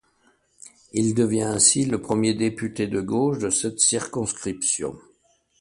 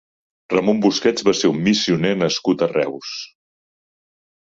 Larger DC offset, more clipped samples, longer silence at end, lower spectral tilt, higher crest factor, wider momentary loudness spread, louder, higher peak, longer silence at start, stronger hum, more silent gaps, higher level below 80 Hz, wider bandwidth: neither; neither; second, 0.6 s vs 1.25 s; about the same, -3.5 dB/octave vs -4.5 dB/octave; about the same, 20 dB vs 18 dB; about the same, 11 LU vs 12 LU; second, -22 LUFS vs -18 LUFS; about the same, -4 dBFS vs -2 dBFS; first, 0.65 s vs 0.5 s; neither; neither; about the same, -56 dBFS vs -58 dBFS; first, 11.5 kHz vs 7.8 kHz